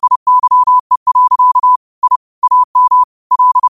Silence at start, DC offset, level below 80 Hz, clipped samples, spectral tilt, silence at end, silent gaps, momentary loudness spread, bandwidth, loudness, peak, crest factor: 0.05 s; 0.3%; -62 dBFS; under 0.1%; -1.5 dB/octave; 0 s; 0.16-0.26 s, 0.80-0.90 s, 0.97-1.06 s, 1.76-2.02 s, 2.16-2.42 s, 2.64-2.74 s, 3.04-3.30 s; 6 LU; 1.4 kHz; -10 LUFS; -2 dBFS; 8 dB